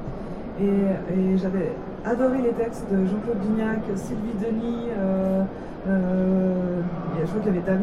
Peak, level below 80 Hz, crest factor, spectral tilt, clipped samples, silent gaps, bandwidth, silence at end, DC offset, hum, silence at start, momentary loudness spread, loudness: -10 dBFS; -44 dBFS; 14 dB; -9 dB/octave; under 0.1%; none; 10 kHz; 0 s; under 0.1%; none; 0 s; 7 LU; -25 LUFS